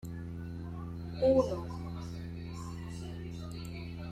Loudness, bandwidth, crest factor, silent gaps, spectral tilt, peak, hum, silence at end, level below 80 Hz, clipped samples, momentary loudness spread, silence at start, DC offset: -36 LUFS; 14 kHz; 20 dB; none; -7.5 dB/octave; -16 dBFS; none; 0 s; -52 dBFS; under 0.1%; 14 LU; 0 s; under 0.1%